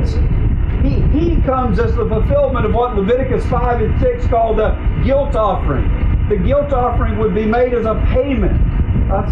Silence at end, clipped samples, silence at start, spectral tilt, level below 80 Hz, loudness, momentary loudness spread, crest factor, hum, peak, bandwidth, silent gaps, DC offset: 0 s; under 0.1%; 0 s; -9.5 dB/octave; -18 dBFS; -16 LUFS; 2 LU; 8 dB; none; -6 dBFS; 5.8 kHz; none; under 0.1%